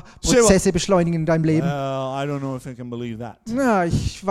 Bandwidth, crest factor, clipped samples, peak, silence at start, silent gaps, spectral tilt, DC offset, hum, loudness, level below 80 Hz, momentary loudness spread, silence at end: 14.5 kHz; 18 dB; under 0.1%; -2 dBFS; 0.05 s; none; -5 dB/octave; under 0.1%; none; -20 LUFS; -38 dBFS; 15 LU; 0 s